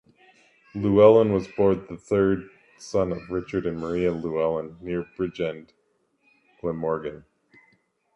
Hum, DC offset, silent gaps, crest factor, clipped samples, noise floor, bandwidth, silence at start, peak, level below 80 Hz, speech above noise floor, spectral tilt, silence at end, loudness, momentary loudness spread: none; under 0.1%; none; 22 dB; under 0.1%; -69 dBFS; 8.2 kHz; 0.75 s; -4 dBFS; -52 dBFS; 46 dB; -7.5 dB/octave; 1 s; -24 LUFS; 15 LU